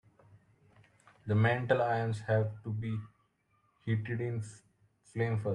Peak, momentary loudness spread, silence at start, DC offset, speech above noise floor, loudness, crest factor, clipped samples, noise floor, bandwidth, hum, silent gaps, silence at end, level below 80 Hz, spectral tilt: -14 dBFS; 16 LU; 1.25 s; under 0.1%; 42 dB; -33 LUFS; 22 dB; under 0.1%; -74 dBFS; 10 kHz; none; none; 0 s; -68 dBFS; -7.5 dB/octave